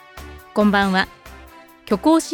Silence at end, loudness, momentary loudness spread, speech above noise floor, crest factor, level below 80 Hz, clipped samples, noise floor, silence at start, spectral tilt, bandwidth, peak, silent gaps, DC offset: 0 s; -19 LUFS; 18 LU; 27 dB; 18 dB; -44 dBFS; under 0.1%; -44 dBFS; 0.15 s; -5 dB/octave; 17.5 kHz; -2 dBFS; none; under 0.1%